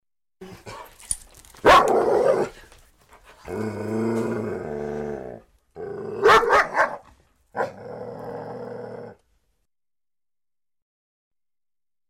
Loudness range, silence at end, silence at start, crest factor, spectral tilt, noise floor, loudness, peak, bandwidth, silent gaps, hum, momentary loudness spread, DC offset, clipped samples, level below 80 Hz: 17 LU; 2.95 s; 0.4 s; 20 dB; -4 dB/octave; under -90 dBFS; -21 LUFS; -6 dBFS; 16 kHz; none; none; 24 LU; under 0.1%; under 0.1%; -50 dBFS